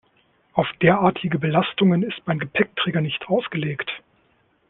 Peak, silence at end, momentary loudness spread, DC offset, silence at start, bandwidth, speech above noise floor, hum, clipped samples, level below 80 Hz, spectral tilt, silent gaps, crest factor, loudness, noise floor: -2 dBFS; 0.7 s; 9 LU; under 0.1%; 0.55 s; 4.1 kHz; 42 dB; none; under 0.1%; -58 dBFS; -10 dB/octave; none; 20 dB; -22 LUFS; -63 dBFS